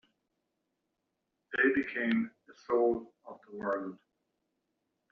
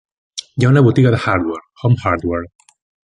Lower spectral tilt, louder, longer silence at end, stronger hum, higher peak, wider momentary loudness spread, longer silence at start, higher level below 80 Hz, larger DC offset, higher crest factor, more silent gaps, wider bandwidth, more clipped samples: second, -4 dB/octave vs -7.5 dB/octave; second, -32 LUFS vs -15 LUFS; first, 1.15 s vs 0.7 s; neither; second, -16 dBFS vs 0 dBFS; about the same, 18 LU vs 17 LU; first, 1.5 s vs 0.35 s; second, -72 dBFS vs -40 dBFS; neither; about the same, 20 dB vs 16 dB; neither; second, 6.2 kHz vs 10.5 kHz; neither